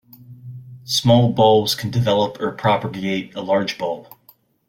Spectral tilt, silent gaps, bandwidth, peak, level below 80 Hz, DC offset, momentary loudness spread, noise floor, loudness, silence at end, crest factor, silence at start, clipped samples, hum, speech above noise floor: -5.5 dB/octave; none; 16.5 kHz; -4 dBFS; -56 dBFS; under 0.1%; 19 LU; -55 dBFS; -19 LUFS; 0.65 s; 16 dB; 0.2 s; under 0.1%; none; 36 dB